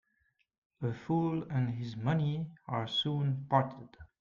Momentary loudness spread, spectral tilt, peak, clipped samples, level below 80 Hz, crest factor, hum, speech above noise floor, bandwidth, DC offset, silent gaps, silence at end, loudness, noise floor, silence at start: 8 LU; -7.5 dB/octave; -14 dBFS; under 0.1%; -66 dBFS; 20 dB; none; 44 dB; 7.2 kHz; under 0.1%; none; 0.15 s; -34 LUFS; -76 dBFS; 0.8 s